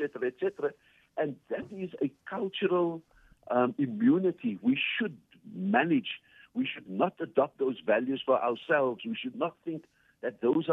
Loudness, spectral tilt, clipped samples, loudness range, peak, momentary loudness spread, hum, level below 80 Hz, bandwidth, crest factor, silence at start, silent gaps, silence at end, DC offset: -31 LUFS; -8 dB/octave; under 0.1%; 4 LU; -12 dBFS; 12 LU; none; -74 dBFS; 4 kHz; 20 dB; 0 s; none; 0 s; under 0.1%